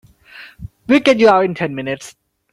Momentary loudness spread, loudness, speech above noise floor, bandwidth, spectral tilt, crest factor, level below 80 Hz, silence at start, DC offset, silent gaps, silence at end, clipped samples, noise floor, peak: 23 LU; -14 LUFS; 27 dB; 12.5 kHz; -5.5 dB/octave; 16 dB; -50 dBFS; 0.35 s; under 0.1%; none; 0.4 s; under 0.1%; -41 dBFS; 0 dBFS